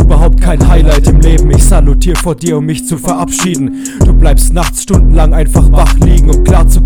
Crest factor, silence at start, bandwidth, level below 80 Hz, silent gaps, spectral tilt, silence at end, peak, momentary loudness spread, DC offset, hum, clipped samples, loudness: 6 dB; 0 s; 15 kHz; -6 dBFS; none; -6 dB/octave; 0 s; 0 dBFS; 6 LU; under 0.1%; none; 6%; -9 LUFS